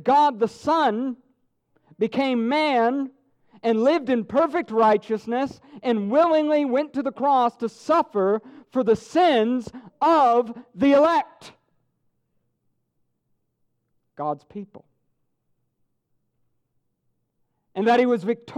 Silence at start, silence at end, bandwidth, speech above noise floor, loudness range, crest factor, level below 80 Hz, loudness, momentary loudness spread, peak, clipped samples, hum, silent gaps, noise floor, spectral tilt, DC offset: 0.05 s; 0 s; 11 kHz; 52 dB; 17 LU; 16 dB; -66 dBFS; -22 LUFS; 12 LU; -8 dBFS; under 0.1%; none; none; -73 dBFS; -6 dB/octave; under 0.1%